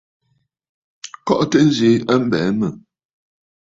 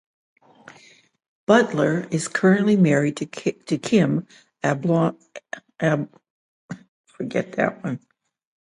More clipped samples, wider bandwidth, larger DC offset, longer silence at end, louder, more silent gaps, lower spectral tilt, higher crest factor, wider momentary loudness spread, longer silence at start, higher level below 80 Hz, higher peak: neither; second, 7.8 kHz vs 11.5 kHz; neither; first, 1 s vs 0.7 s; first, -17 LUFS vs -21 LUFS; second, none vs 6.30-6.69 s, 6.88-7.04 s; about the same, -6 dB/octave vs -6.5 dB/octave; about the same, 18 dB vs 22 dB; second, 16 LU vs 19 LU; second, 1.05 s vs 1.5 s; first, -56 dBFS vs -64 dBFS; about the same, -2 dBFS vs -2 dBFS